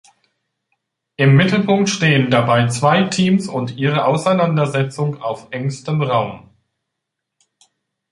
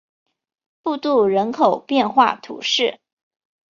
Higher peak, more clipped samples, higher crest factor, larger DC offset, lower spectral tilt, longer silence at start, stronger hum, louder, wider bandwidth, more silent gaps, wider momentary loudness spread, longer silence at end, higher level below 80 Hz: about the same, -2 dBFS vs -2 dBFS; neither; about the same, 16 dB vs 18 dB; neither; first, -6 dB/octave vs -4 dB/octave; first, 1.2 s vs 0.85 s; neither; about the same, -16 LUFS vs -18 LUFS; first, 11.5 kHz vs 7.4 kHz; neither; about the same, 10 LU vs 8 LU; first, 1.75 s vs 0.75 s; first, -56 dBFS vs -66 dBFS